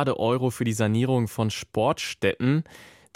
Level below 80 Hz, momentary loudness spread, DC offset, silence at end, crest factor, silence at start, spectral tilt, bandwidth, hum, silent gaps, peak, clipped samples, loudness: -58 dBFS; 4 LU; under 0.1%; 0.3 s; 16 dB; 0 s; -6 dB/octave; 16.5 kHz; none; none; -10 dBFS; under 0.1%; -25 LUFS